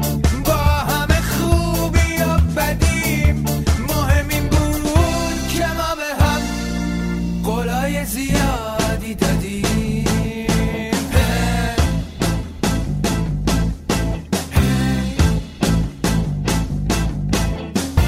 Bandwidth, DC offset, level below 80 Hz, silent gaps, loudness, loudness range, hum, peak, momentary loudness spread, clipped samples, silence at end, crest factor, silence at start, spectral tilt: 16 kHz; under 0.1%; -24 dBFS; none; -19 LUFS; 3 LU; none; -2 dBFS; 5 LU; under 0.1%; 0 s; 16 dB; 0 s; -5.5 dB/octave